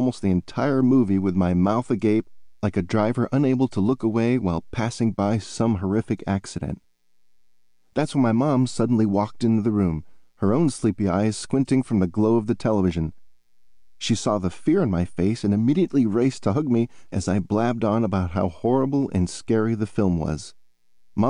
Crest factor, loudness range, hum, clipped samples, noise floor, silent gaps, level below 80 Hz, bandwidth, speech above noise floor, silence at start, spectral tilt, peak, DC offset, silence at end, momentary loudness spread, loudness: 12 dB; 3 LU; none; under 0.1%; -70 dBFS; none; -48 dBFS; 10.5 kHz; 49 dB; 0 s; -7 dB/octave; -10 dBFS; under 0.1%; 0 s; 7 LU; -23 LUFS